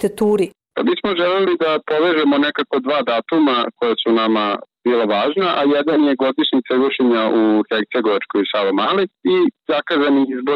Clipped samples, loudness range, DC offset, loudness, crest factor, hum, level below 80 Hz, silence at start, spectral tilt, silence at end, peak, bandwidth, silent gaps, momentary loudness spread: under 0.1%; 1 LU; under 0.1%; -17 LUFS; 10 dB; none; -62 dBFS; 0 s; -6 dB/octave; 0 s; -8 dBFS; 12 kHz; none; 4 LU